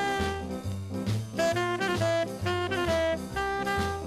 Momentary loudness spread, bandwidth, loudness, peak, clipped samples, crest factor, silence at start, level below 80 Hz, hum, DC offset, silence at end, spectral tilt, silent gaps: 7 LU; 15.5 kHz; -29 LUFS; -14 dBFS; under 0.1%; 14 dB; 0 s; -46 dBFS; none; under 0.1%; 0 s; -5 dB/octave; none